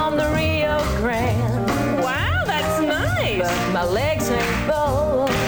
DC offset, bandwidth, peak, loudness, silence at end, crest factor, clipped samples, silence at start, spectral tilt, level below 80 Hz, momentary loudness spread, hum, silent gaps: 0.2%; over 20 kHz; -10 dBFS; -20 LUFS; 0 s; 10 dB; under 0.1%; 0 s; -5.5 dB/octave; -34 dBFS; 1 LU; none; none